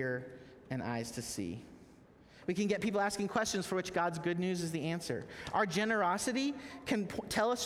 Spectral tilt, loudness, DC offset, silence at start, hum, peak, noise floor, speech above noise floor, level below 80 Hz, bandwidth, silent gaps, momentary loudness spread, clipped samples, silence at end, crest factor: -4.5 dB/octave; -35 LUFS; under 0.1%; 0 s; none; -18 dBFS; -60 dBFS; 25 dB; -64 dBFS; 16.5 kHz; none; 11 LU; under 0.1%; 0 s; 18 dB